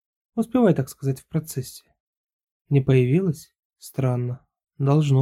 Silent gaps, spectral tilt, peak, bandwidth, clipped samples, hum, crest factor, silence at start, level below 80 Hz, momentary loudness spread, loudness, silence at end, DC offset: 2.00-2.24 s, 2.33-2.65 s, 3.59-3.70 s; -8 dB/octave; -6 dBFS; 14.5 kHz; under 0.1%; none; 16 dB; 0.35 s; -56 dBFS; 14 LU; -23 LUFS; 0 s; under 0.1%